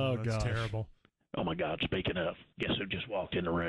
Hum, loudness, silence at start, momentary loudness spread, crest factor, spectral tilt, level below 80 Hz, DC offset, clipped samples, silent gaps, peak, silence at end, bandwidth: none; -35 LUFS; 0 s; 6 LU; 14 dB; -6 dB/octave; -50 dBFS; under 0.1%; under 0.1%; none; -22 dBFS; 0 s; 11 kHz